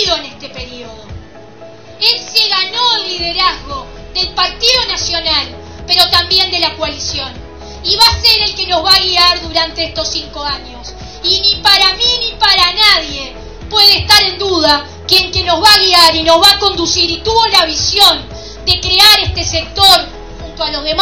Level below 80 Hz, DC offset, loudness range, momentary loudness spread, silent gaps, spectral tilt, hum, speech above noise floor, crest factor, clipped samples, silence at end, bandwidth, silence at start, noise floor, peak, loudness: -32 dBFS; 0.9%; 5 LU; 18 LU; none; -1.5 dB/octave; none; 23 dB; 12 dB; 0.6%; 0 s; over 20 kHz; 0 s; -34 dBFS; 0 dBFS; -9 LUFS